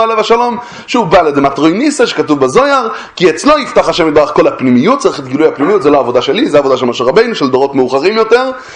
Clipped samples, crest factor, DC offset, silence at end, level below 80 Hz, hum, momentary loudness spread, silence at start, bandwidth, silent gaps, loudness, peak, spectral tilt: 0.5%; 10 dB; under 0.1%; 0 s; -44 dBFS; none; 4 LU; 0 s; 10.5 kHz; none; -10 LUFS; 0 dBFS; -5 dB/octave